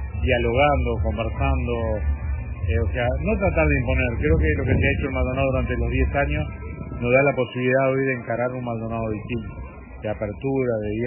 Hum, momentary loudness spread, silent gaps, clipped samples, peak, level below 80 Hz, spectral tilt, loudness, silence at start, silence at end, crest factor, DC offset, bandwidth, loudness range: none; 10 LU; none; under 0.1%; -6 dBFS; -28 dBFS; -11.5 dB/octave; -23 LUFS; 0 s; 0 s; 16 dB; under 0.1%; 3.1 kHz; 3 LU